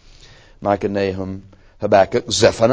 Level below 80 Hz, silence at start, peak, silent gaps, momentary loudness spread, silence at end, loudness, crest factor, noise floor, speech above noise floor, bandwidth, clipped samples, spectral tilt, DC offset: -44 dBFS; 0.6 s; 0 dBFS; none; 14 LU; 0 s; -18 LUFS; 18 dB; -45 dBFS; 28 dB; 8 kHz; under 0.1%; -4.5 dB/octave; under 0.1%